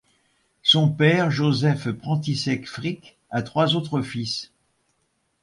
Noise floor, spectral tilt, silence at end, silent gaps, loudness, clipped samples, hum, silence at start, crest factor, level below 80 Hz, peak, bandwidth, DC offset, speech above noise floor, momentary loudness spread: -71 dBFS; -5.5 dB/octave; 0.95 s; none; -22 LUFS; under 0.1%; none; 0.65 s; 20 dB; -60 dBFS; -4 dBFS; 11.5 kHz; under 0.1%; 48 dB; 13 LU